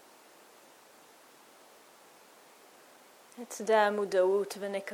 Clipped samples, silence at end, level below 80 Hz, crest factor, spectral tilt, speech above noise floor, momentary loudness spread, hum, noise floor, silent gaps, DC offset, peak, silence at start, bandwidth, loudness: under 0.1%; 0 s; -90 dBFS; 20 dB; -4 dB/octave; 29 dB; 20 LU; none; -58 dBFS; none; under 0.1%; -14 dBFS; 3.35 s; 18 kHz; -29 LUFS